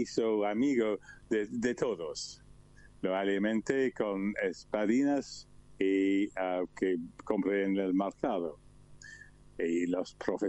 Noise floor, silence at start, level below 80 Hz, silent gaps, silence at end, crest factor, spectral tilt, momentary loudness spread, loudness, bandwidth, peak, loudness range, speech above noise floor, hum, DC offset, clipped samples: -56 dBFS; 0 s; -64 dBFS; none; 0 s; 16 dB; -5.5 dB/octave; 11 LU; -32 LUFS; 8.4 kHz; -16 dBFS; 2 LU; 25 dB; none; under 0.1%; under 0.1%